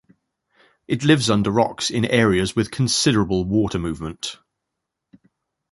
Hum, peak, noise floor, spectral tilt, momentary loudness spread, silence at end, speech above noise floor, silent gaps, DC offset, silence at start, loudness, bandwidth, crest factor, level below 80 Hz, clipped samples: none; -2 dBFS; -81 dBFS; -5 dB/octave; 11 LU; 1.35 s; 61 dB; none; under 0.1%; 0.9 s; -20 LUFS; 11.5 kHz; 20 dB; -44 dBFS; under 0.1%